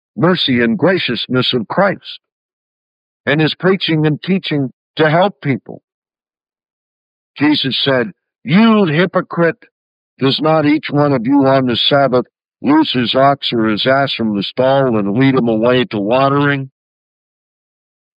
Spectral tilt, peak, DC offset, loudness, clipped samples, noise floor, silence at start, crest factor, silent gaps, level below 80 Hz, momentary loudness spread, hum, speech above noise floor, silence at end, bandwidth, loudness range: -8.5 dB/octave; -2 dBFS; under 0.1%; -14 LUFS; under 0.1%; under -90 dBFS; 0.15 s; 14 dB; 2.32-3.24 s, 4.73-4.94 s, 5.84-5.88 s, 5.94-6.02 s, 6.70-7.34 s, 9.71-10.17 s; -64 dBFS; 8 LU; none; over 77 dB; 1.5 s; 5.2 kHz; 5 LU